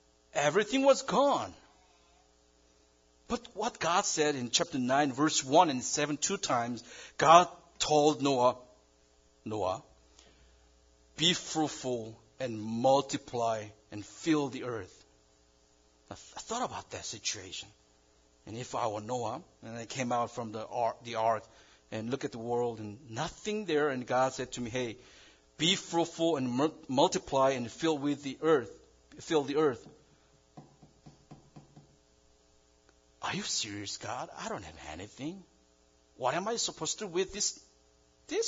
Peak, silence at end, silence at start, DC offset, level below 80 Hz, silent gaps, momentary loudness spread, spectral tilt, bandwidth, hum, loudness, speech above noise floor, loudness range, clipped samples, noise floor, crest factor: -6 dBFS; 0 s; 0.35 s; under 0.1%; -66 dBFS; none; 17 LU; -3.5 dB/octave; 7.8 kHz; none; -31 LUFS; 35 dB; 11 LU; under 0.1%; -66 dBFS; 28 dB